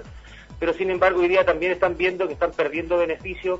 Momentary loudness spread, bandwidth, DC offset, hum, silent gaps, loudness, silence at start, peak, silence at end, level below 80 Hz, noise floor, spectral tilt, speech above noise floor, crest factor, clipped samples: 7 LU; 7.8 kHz; under 0.1%; none; none; -22 LUFS; 0 s; -4 dBFS; 0 s; -44 dBFS; -42 dBFS; -6 dB/octave; 21 dB; 18 dB; under 0.1%